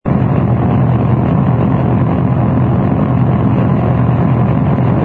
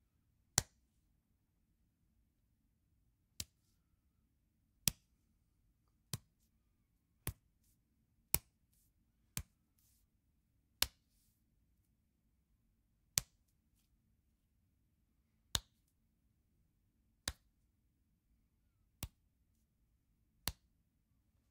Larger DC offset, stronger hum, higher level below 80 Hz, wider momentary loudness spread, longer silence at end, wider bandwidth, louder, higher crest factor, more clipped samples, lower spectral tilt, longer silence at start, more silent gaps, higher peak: neither; neither; first, -28 dBFS vs -64 dBFS; second, 1 LU vs 12 LU; second, 0 s vs 1 s; second, 3.8 kHz vs 16 kHz; first, -12 LUFS vs -42 LUFS; second, 12 dB vs 46 dB; neither; first, -11.5 dB/octave vs -1 dB/octave; second, 0.05 s vs 0.55 s; neither; first, 0 dBFS vs -4 dBFS